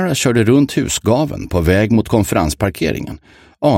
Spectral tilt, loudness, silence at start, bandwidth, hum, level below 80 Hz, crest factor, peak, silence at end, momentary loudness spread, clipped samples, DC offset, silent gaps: -5.5 dB/octave; -15 LUFS; 0 s; 16.5 kHz; none; -32 dBFS; 14 dB; 0 dBFS; 0 s; 7 LU; under 0.1%; under 0.1%; none